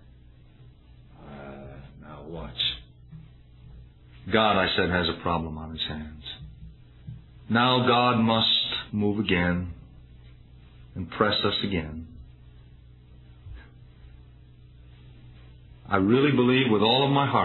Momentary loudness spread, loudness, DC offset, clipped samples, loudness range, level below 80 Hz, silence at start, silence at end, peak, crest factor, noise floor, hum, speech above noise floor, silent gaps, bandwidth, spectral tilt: 24 LU; -24 LUFS; under 0.1%; under 0.1%; 12 LU; -50 dBFS; 0.6 s; 0 s; -6 dBFS; 22 dB; -52 dBFS; none; 28 dB; none; 4.3 kHz; -8 dB/octave